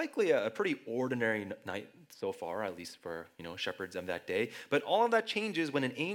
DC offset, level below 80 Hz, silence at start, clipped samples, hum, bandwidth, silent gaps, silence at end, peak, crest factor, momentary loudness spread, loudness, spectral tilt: under 0.1%; -82 dBFS; 0 s; under 0.1%; none; 17.5 kHz; none; 0 s; -16 dBFS; 20 dB; 14 LU; -34 LUFS; -5 dB/octave